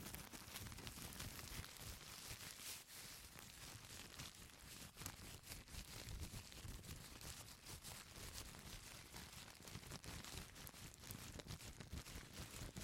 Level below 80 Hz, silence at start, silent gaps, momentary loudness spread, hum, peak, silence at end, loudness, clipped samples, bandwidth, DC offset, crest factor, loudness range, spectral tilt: -62 dBFS; 0 s; none; 4 LU; none; -28 dBFS; 0 s; -54 LUFS; under 0.1%; 16.5 kHz; under 0.1%; 28 dB; 2 LU; -2.5 dB/octave